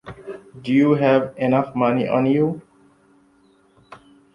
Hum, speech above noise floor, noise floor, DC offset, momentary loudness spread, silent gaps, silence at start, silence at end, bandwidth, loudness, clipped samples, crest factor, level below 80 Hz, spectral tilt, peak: none; 39 dB; -57 dBFS; under 0.1%; 19 LU; none; 0.05 s; 0.4 s; 6.8 kHz; -19 LUFS; under 0.1%; 18 dB; -60 dBFS; -9 dB/octave; -4 dBFS